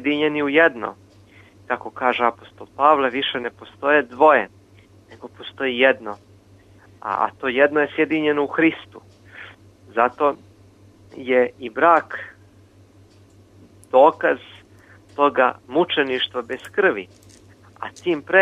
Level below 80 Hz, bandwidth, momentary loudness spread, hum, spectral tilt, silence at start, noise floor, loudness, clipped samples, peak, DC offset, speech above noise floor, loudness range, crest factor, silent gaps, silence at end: -64 dBFS; 11 kHz; 20 LU; none; -5.5 dB/octave; 0 s; -51 dBFS; -19 LUFS; under 0.1%; -2 dBFS; under 0.1%; 31 dB; 3 LU; 20 dB; none; 0 s